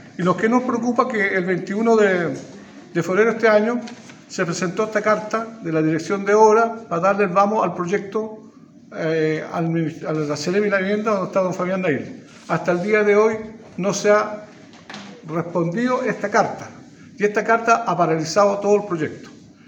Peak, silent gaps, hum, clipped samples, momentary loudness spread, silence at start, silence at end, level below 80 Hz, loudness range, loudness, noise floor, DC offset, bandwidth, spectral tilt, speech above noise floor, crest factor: 0 dBFS; none; none; under 0.1%; 13 LU; 0 s; 0.3 s; -68 dBFS; 4 LU; -20 LUFS; -40 dBFS; under 0.1%; 16 kHz; -5.5 dB/octave; 21 dB; 20 dB